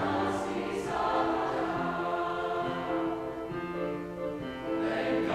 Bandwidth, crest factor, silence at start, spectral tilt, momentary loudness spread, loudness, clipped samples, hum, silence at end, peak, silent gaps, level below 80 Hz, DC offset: 13.5 kHz; 18 dB; 0 s; -6 dB/octave; 7 LU; -32 LUFS; under 0.1%; none; 0 s; -14 dBFS; none; -56 dBFS; under 0.1%